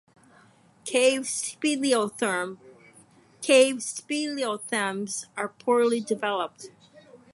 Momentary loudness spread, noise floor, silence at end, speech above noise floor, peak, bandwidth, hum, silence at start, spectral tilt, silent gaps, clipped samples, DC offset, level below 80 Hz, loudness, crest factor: 14 LU; -57 dBFS; 0.2 s; 32 dB; -8 dBFS; 11.5 kHz; none; 0.85 s; -2.5 dB/octave; none; under 0.1%; under 0.1%; -78 dBFS; -25 LUFS; 20 dB